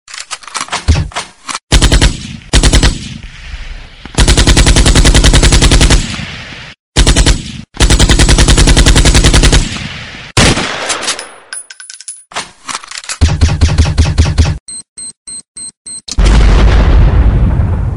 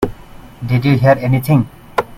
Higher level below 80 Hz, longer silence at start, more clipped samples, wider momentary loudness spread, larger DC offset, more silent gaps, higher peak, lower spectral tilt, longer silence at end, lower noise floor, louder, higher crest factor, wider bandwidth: first, -12 dBFS vs -38 dBFS; about the same, 0.1 s vs 0 s; first, 0.9% vs under 0.1%; first, 18 LU vs 10 LU; first, 0.3% vs under 0.1%; first, 1.63-1.67 s, 6.79-6.93 s, 14.60-14.66 s, 14.88-14.96 s, 15.17-15.26 s, 15.48-15.55 s, 15.77-15.85 s vs none; about the same, 0 dBFS vs 0 dBFS; second, -4 dB/octave vs -8 dB/octave; about the same, 0 s vs 0 s; second, -30 dBFS vs -36 dBFS; first, -9 LUFS vs -15 LUFS; second, 10 dB vs 16 dB; second, 12 kHz vs 15.5 kHz